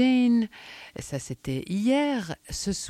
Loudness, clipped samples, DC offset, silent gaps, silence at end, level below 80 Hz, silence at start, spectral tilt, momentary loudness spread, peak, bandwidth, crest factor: -27 LUFS; under 0.1%; under 0.1%; none; 0 s; -52 dBFS; 0 s; -5 dB/octave; 16 LU; -12 dBFS; 13.5 kHz; 14 dB